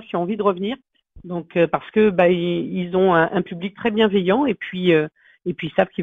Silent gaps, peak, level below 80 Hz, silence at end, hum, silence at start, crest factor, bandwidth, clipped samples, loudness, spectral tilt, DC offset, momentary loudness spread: none; -2 dBFS; -56 dBFS; 0 s; none; 0 s; 18 dB; 4.5 kHz; under 0.1%; -20 LUFS; -9 dB/octave; under 0.1%; 13 LU